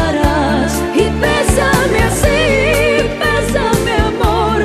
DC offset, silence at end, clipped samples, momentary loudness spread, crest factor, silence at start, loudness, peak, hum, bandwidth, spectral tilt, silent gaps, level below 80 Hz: under 0.1%; 0 s; under 0.1%; 3 LU; 12 dB; 0 s; -13 LUFS; 0 dBFS; none; 14 kHz; -5 dB/octave; none; -22 dBFS